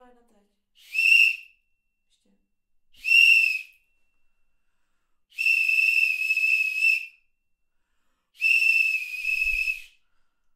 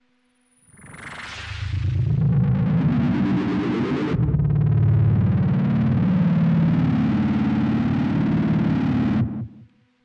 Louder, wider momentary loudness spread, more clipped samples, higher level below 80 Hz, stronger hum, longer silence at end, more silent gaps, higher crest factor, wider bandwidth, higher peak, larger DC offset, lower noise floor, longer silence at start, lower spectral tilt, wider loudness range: about the same, -19 LUFS vs -21 LUFS; first, 14 LU vs 11 LU; neither; second, -56 dBFS vs -40 dBFS; neither; first, 0.7 s vs 0.4 s; neither; first, 20 dB vs 10 dB; first, 16 kHz vs 10.5 kHz; first, -6 dBFS vs -10 dBFS; neither; first, -72 dBFS vs -64 dBFS; about the same, 0.9 s vs 0.85 s; second, 3.5 dB/octave vs -9 dB/octave; about the same, 4 LU vs 3 LU